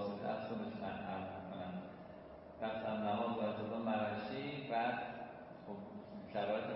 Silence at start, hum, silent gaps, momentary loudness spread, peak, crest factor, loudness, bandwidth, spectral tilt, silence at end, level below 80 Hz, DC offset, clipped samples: 0 s; none; none; 13 LU; -26 dBFS; 16 dB; -42 LUFS; 5.6 kHz; -4.5 dB/octave; 0 s; -72 dBFS; under 0.1%; under 0.1%